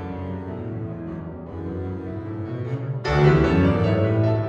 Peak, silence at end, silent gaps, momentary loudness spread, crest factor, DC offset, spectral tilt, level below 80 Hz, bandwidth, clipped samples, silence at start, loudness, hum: -4 dBFS; 0 s; none; 15 LU; 18 dB; under 0.1%; -8.5 dB/octave; -38 dBFS; 7.6 kHz; under 0.1%; 0 s; -23 LUFS; none